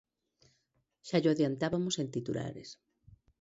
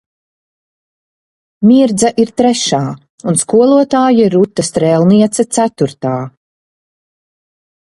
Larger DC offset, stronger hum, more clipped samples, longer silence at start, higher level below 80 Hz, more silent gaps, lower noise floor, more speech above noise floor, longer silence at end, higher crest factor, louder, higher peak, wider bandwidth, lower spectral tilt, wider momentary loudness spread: neither; neither; neither; second, 1.05 s vs 1.6 s; second, -68 dBFS vs -52 dBFS; second, none vs 3.10-3.18 s; second, -78 dBFS vs under -90 dBFS; second, 46 dB vs over 79 dB; second, 0.7 s vs 1.55 s; first, 20 dB vs 12 dB; second, -33 LUFS vs -11 LUFS; second, -16 dBFS vs 0 dBFS; second, 8 kHz vs 11.5 kHz; about the same, -5.5 dB/octave vs -5.5 dB/octave; first, 19 LU vs 10 LU